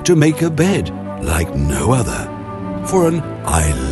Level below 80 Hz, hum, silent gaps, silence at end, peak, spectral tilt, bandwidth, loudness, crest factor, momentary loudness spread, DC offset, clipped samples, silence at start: -26 dBFS; none; none; 0 s; 0 dBFS; -5.5 dB/octave; 12.5 kHz; -17 LUFS; 16 dB; 10 LU; under 0.1%; under 0.1%; 0 s